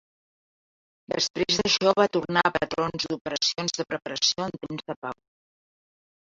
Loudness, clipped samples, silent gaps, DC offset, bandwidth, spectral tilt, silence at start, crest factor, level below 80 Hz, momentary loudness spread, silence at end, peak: -25 LUFS; under 0.1%; 1.30-1.34 s, 3.21-3.25 s, 4.96-5.02 s; under 0.1%; 7.8 kHz; -3 dB/octave; 1.1 s; 24 dB; -60 dBFS; 14 LU; 1.2 s; -4 dBFS